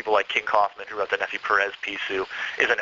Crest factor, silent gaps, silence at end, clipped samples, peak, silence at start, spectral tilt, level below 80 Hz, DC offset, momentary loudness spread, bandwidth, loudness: 20 dB; none; 0 s; under 0.1%; -4 dBFS; 0 s; 1.5 dB/octave; -64 dBFS; under 0.1%; 7 LU; 7.6 kHz; -24 LUFS